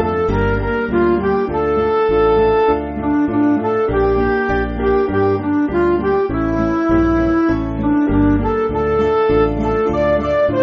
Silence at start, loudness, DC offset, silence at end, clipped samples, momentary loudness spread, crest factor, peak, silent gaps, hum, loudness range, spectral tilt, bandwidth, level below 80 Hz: 0 s; -16 LUFS; under 0.1%; 0 s; under 0.1%; 3 LU; 12 dB; -4 dBFS; none; none; 1 LU; -6.5 dB/octave; 6.4 kHz; -28 dBFS